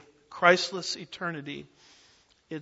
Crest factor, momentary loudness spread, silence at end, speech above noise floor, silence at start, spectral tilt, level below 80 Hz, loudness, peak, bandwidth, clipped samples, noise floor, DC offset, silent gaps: 26 dB; 20 LU; 0 s; 34 dB; 0.3 s; -3.5 dB/octave; -74 dBFS; -27 LUFS; -4 dBFS; 8 kHz; under 0.1%; -62 dBFS; under 0.1%; none